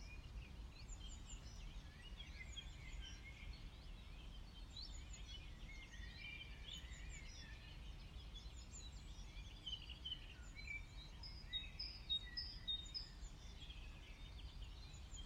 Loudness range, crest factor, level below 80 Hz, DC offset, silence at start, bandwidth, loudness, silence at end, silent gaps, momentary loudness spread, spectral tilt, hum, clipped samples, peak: 8 LU; 18 dB; -56 dBFS; under 0.1%; 0 s; 16 kHz; -53 LUFS; 0 s; none; 11 LU; -3 dB/octave; none; under 0.1%; -34 dBFS